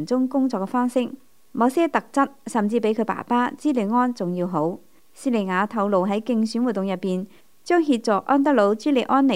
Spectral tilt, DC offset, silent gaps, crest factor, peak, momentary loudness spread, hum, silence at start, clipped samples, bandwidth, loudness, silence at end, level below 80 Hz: -6.5 dB/octave; 0.3%; none; 16 dB; -4 dBFS; 7 LU; none; 0 s; under 0.1%; 15 kHz; -22 LUFS; 0 s; -72 dBFS